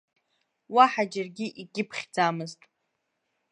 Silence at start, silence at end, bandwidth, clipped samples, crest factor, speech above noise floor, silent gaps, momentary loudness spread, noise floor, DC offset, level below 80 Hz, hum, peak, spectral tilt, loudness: 0.7 s; 1 s; 11 kHz; under 0.1%; 24 dB; 52 dB; none; 15 LU; -79 dBFS; under 0.1%; -82 dBFS; none; -6 dBFS; -4.5 dB/octave; -26 LUFS